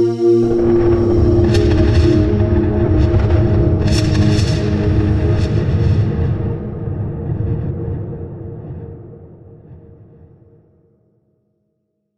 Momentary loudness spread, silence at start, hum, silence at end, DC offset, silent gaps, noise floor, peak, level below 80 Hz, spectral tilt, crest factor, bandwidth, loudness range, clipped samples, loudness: 15 LU; 0 s; none; 1.7 s; 0.8%; none; -69 dBFS; -2 dBFS; -24 dBFS; -8 dB/octave; 14 dB; 10 kHz; 16 LU; under 0.1%; -15 LUFS